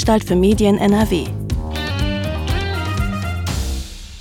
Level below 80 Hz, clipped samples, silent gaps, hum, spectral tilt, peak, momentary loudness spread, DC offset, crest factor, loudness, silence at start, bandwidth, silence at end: -28 dBFS; under 0.1%; none; none; -6 dB/octave; -4 dBFS; 10 LU; under 0.1%; 14 dB; -19 LUFS; 0 s; 17 kHz; 0 s